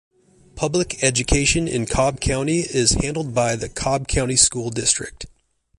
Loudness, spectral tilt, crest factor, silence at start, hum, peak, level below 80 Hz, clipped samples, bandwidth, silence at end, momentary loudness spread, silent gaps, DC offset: -19 LUFS; -3.5 dB/octave; 22 dB; 0.55 s; none; 0 dBFS; -34 dBFS; under 0.1%; 11.5 kHz; 0.5 s; 7 LU; none; under 0.1%